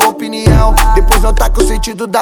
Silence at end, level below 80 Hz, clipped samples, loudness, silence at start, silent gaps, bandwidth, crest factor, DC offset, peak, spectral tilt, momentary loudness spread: 0 s; -10 dBFS; 1%; -11 LUFS; 0 s; none; 19.5 kHz; 8 dB; under 0.1%; 0 dBFS; -4.5 dB/octave; 5 LU